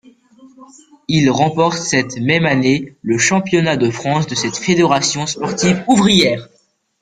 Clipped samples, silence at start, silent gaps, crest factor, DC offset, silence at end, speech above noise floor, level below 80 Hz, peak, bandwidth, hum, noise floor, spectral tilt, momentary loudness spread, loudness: under 0.1%; 0.45 s; none; 16 dB; under 0.1%; 0.6 s; 30 dB; -50 dBFS; 0 dBFS; 11 kHz; none; -45 dBFS; -4.5 dB/octave; 7 LU; -15 LUFS